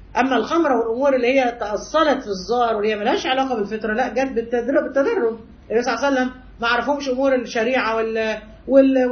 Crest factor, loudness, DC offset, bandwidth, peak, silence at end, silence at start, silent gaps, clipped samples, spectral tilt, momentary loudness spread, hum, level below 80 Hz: 18 dB; -20 LUFS; under 0.1%; 6.6 kHz; -2 dBFS; 0 s; 0 s; none; under 0.1%; -4.5 dB/octave; 6 LU; none; -48 dBFS